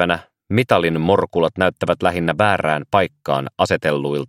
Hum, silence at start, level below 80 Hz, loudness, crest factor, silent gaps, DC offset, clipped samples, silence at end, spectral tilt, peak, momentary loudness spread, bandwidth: none; 0 s; -50 dBFS; -18 LUFS; 18 dB; none; under 0.1%; under 0.1%; 0.05 s; -6 dB/octave; 0 dBFS; 5 LU; 15.5 kHz